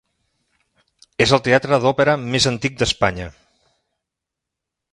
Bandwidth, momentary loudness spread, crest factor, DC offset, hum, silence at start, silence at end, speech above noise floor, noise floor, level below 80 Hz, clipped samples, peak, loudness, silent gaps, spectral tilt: 11.5 kHz; 13 LU; 20 dB; under 0.1%; none; 1.2 s; 1.65 s; 66 dB; -83 dBFS; -44 dBFS; under 0.1%; 0 dBFS; -17 LUFS; none; -4 dB/octave